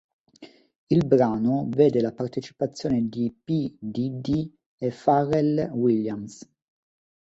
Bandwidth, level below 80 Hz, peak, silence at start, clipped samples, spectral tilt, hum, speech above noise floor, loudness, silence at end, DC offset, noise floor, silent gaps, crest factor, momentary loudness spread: 8 kHz; -58 dBFS; -6 dBFS; 0.4 s; under 0.1%; -8 dB/octave; none; 27 dB; -24 LUFS; 0.8 s; under 0.1%; -50 dBFS; 0.78-0.87 s, 4.66-4.78 s; 20 dB; 11 LU